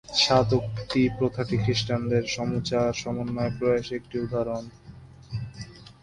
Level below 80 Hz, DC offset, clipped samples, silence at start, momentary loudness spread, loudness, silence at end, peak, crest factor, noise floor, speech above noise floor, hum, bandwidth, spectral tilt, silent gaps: -50 dBFS; under 0.1%; under 0.1%; 0.1 s; 15 LU; -26 LUFS; 0.1 s; -6 dBFS; 20 dB; -47 dBFS; 21 dB; none; 11 kHz; -5.5 dB/octave; none